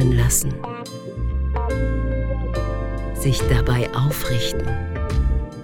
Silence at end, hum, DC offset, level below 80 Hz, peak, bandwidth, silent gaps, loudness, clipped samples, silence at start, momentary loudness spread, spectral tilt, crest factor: 0 s; none; under 0.1%; -24 dBFS; -4 dBFS; 17.5 kHz; none; -22 LUFS; under 0.1%; 0 s; 9 LU; -5 dB/octave; 16 dB